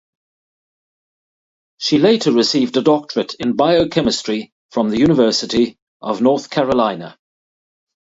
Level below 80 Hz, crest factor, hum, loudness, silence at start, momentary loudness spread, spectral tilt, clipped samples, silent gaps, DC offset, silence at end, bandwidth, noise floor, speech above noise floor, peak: -50 dBFS; 18 dB; none; -16 LUFS; 1.8 s; 11 LU; -5 dB/octave; under 0.1%; 4.52-4.69 s, 5.82-6.00 s; under 0.1%; 1 s; 8 kHz; under -90 dBFS; over 75 dB; 0 dBFS